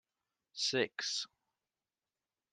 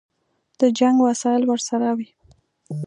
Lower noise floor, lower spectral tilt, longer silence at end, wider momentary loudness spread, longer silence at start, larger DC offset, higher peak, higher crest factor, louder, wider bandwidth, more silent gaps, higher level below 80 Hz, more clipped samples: first, under -90 dBFS vs -69 dBFS; second, -2 dB/octave vs -5 dB/octave; first, 1.25 s vs 0 s; about the same, 14 LU vs 13 LU; about the same, 0.55 s vs 0.6 s; neither; second, -20 dBFS vs -4 dBFS; first, 22 dB vs 16 dB; second, -36 LUFS vs -20 LUFS; first, 12 kHz vs 10 kHz; neither; second, -88 dBFS vs -68 dBFS; neither